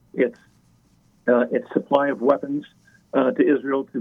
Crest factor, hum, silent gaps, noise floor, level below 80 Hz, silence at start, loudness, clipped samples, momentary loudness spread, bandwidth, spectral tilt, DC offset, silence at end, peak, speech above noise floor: 20 dB; none; none; -59 dBFS; -68 dBFS; 0.15 s; -22 LUFS; under 0.1%; 7 LU; 6.2 kHz; -8 dB/octave; under 0.1%; 0 s; -2 dBFS; 38 dB